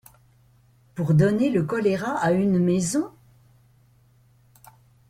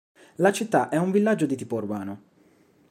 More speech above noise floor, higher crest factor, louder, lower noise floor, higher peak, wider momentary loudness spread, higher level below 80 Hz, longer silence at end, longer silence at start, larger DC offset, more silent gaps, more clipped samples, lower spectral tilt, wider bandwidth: about the same, 37 dB vs 36 dB; about the same, 18 dB vs 20 dB; about the same, -22 LUFS vs -24 LUFS; about the same, -58 dBFS vs -59 dBFS; about the same, -8 dBFS vs -6 dBFS; about the same, 10 LU vs 11 LU; first, -58 dBFS vs -74 dBFS; first, 2 s vs 0.75 s; first, 0.95 s vs 0.4 s; neither; neither; neither; about the same, -7 dB/octave vs -6 dB/octave; about the same, 15 kHz vs 15.5 kHz